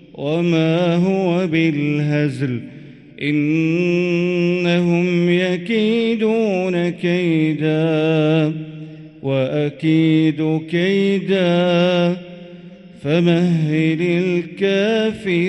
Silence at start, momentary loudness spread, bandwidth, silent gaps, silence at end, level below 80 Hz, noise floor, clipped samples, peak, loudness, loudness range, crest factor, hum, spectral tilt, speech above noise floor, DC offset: 0.15 s; 8 LU; 8.8 kHz; none; 0 s; -60 dBFS; -39 dBFS; under 0.1%; -4 dBFS; -17 LUFS; 2 LU; 14 dB; none; -7.5 dB/octave; 22 dB; under 0.1%